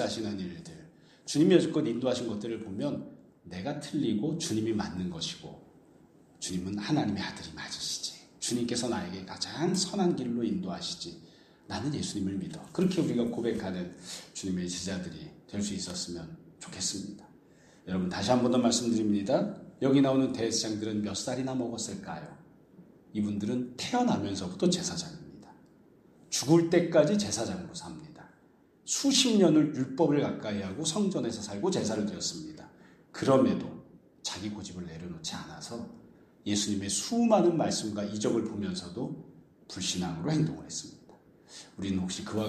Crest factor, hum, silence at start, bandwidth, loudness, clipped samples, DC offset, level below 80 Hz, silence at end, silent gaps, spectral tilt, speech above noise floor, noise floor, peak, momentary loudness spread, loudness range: 22 dB; none; 0 s; 14 kHz; -30 LUFS; under 0.1%; under 0.1%; -64 dBFS; 0 s; none; -4.5 dB/octave; 32 dB; -62 dBFS; -8 dBFS; 18 LU; 7 LU